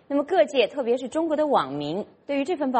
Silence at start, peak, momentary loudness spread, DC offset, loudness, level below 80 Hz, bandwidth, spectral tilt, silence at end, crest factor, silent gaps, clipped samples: 0.1 s; -6 dBFS; 8 LU; under 0.1%; -24 LUFS; -68 dBFS; 8.8 kHz; -5.5 dB/octave; 0 s; 18 dB; none; under 0.1%